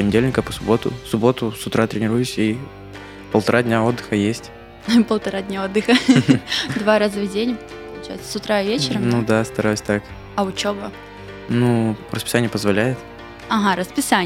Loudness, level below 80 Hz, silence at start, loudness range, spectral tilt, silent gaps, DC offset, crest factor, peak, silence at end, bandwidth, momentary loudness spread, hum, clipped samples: -19 LUFS; -46 dBFS; 0 s; 3 LU; -5.5 dB/octave; none; under 0.1%; 20 dB; 0 dBFS; 0 s; 16 kHz; 16 LU; 50 Hz at -45 dBFS; under 0.1%